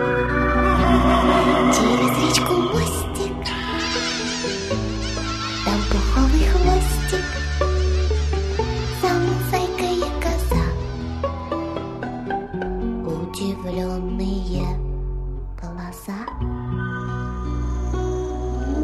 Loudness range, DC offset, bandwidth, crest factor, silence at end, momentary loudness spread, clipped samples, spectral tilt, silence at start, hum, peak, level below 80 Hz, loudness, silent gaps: 9 LU; under 0.1%; 14 kHz; 18 dB; 0 s; 12 LU; under 0.1%; -5 dB/octave; 0 s; none; -2 dBFS; -26 dBFS; -22 LUFS; none